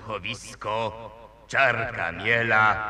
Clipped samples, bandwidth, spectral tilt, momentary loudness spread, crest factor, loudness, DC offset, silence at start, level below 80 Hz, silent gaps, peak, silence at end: under 0.1%; 12.5 kHz; -4 dB/octave; 13 LU; 20 dB; -24 LUFS; under 0.1%; 0 s; -52 dBFS; none; -6 dBFS; 0 s